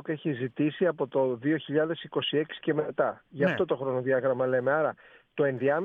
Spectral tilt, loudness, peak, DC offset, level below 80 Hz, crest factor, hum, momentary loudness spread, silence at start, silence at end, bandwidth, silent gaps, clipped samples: -8.5 dB/octave; -28 LUFS; -12 dBFS; under 0.1%; -74 dBFS; 14 dB; none; 5 LU; 0.05 s; 0 s; 4.7 kHz; none; under 0.1%